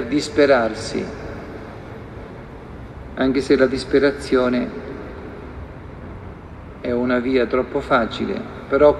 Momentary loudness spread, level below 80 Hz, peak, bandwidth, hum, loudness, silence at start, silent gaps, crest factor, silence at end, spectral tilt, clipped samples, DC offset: 20 LU; -42 dBFS; 0 dBFS; 11 kHz; none; -19 LUFS; 0 s; none; 20 dB; 0 s; -6 dB/octave; under 0.1%; under 0.1%